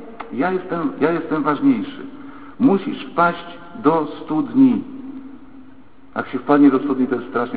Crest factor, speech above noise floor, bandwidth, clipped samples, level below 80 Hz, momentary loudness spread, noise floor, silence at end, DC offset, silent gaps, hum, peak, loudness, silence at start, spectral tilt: 18 dB; 28 dB; 4.7 kHz; under 0.1%; -56 dBFS; 20 LU; -46 dBFS; 0 s; 0.9%; none; none; 0 dBFS; -19 LUFS; 0 s; -11.5 dB/octave